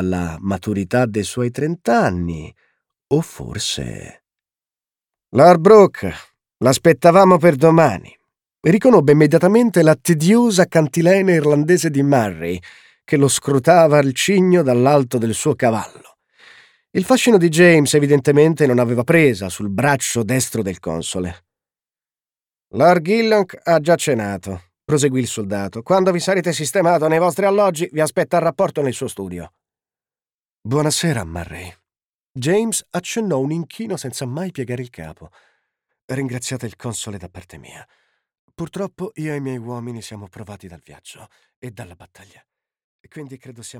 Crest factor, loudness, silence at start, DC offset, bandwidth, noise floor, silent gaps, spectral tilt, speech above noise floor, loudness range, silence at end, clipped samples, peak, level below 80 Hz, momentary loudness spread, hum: 16 dB; -16 LUFS; 0 s; under 0.1%; 18.5 kHz; under -90 dBFS; 30.34-30.39 s, 30.54-30.62 s, 32.04-32.19 s, 32.29-32.35 s, 36.03-36.08 s, 38.39-38.48 s, 41.56-41.62 s, 42.84-43.04 s; -5.5 dB/octave; over 74 dB; 16 LU; 0 s; under 0.1%; 0 dBFS; -52 dBFS; 19 LU; none